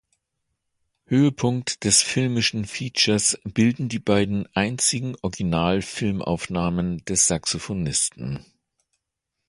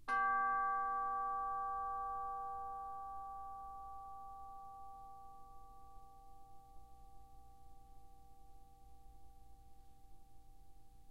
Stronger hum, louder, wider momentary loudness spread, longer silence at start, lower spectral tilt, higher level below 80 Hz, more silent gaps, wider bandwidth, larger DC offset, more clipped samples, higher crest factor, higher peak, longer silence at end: neither; first, -22 LUFS vs -42 LUFS; second, 8 LU vs 28 LU; first, 1.1 s vs 0 s; about the same, -3.5 dB/octave vs -4.5 dB/octave; first, -48 dBFS vs -64 dBFS; neither; second, 11.5 kHz vs 15.5 kHz; second, under 0.1% vs 0.1%; neither; about the same, 20 dB vs 18 dB; first, -4 dBFS vs -26 dBFS; first, 1.05 s vs 0 s